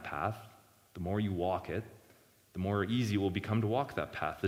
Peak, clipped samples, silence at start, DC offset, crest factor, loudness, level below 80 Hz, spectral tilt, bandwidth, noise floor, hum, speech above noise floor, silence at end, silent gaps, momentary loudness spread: -18 dBFS; under 0.1%; 0 s; under 0.1%; 18 dB; -35 LUFS; -60 dBFS; -7 dB/octave; 16 kHz; -64 dBFS; none; 30 dB; 0 s; none; 13 LU